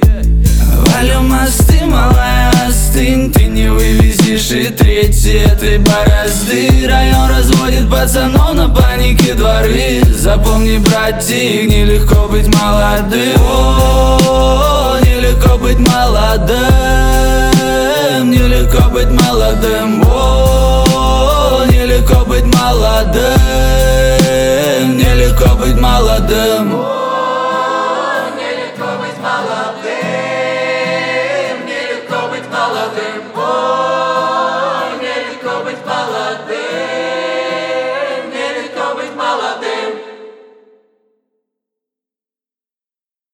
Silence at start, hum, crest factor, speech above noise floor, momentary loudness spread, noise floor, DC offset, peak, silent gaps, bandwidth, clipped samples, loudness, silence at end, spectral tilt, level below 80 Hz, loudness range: 0 s; none; 10 dB; over 82 dB; 9 LU; under -90 dBFS; under 0.1%; 0 dBFS; none; 19.5 kHz; under 0.1%; -11 LUFS; 3.05 s; -5 dB/octave; -14 dBFS; 8 LU